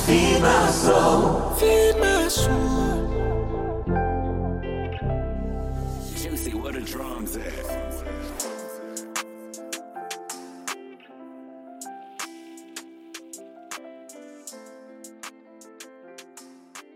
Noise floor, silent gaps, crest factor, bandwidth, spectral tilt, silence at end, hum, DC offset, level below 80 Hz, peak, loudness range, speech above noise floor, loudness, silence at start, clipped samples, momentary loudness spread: -48 dBFS; none; 20 dB; 16.5 kHz; -4.5 dB/octave; 0.15 s; none; under 0.1%; -34 dBFS; -4 dBFS; 20 LU; 27 dB; -24 LUFS; 0 s; under 0.1%; 25 LU